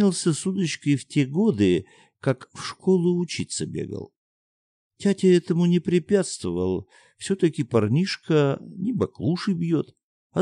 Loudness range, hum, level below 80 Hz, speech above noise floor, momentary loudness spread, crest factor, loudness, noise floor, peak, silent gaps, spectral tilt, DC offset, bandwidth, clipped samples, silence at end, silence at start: 3 LU; none; -62 dBFS; over 67 dB; 10 LU; 16 dB; -24 LUFS; under -90 dBFS; -6 dBFS; 4.17-4.90 s, 10.03-10.30 s; -6 dB/octave; under 0.1%; 10.5 kHz; under 0.1%; 0 s; 0 s